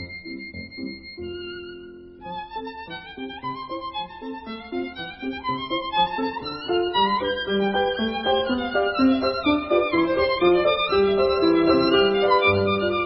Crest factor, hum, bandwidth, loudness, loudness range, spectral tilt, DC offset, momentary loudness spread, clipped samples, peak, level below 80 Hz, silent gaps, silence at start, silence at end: 18 dB; none; 5.8 kHz; -22 LUFS; 14 LU; -9.5 dB/octave; under 0.1%; 17 LU; under 0.1%; -6 dBFS; -48 dBFS; none; 0 s; 0 s